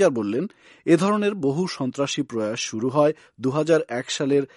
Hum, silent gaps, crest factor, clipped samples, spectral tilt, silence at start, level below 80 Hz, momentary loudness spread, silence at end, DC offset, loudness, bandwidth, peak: none; none; 18 dB; under 0.1%; -5.5 dB/octave; 0 s; -68 dBFS; 7 LU; 0.1 s; under 0.1%; -23 LUFS; 11.5 kHz; -4 dBFS